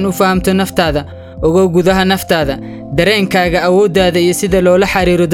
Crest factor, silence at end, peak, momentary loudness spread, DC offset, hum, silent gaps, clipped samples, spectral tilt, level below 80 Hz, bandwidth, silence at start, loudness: 12 dB; 0 s; 0 dBFS; 7 LU; 0.2%; none; none; under 0.1%; -5 dB/octave; -30 dBFS; 17.5 kHz; 0 s; -12 LUFS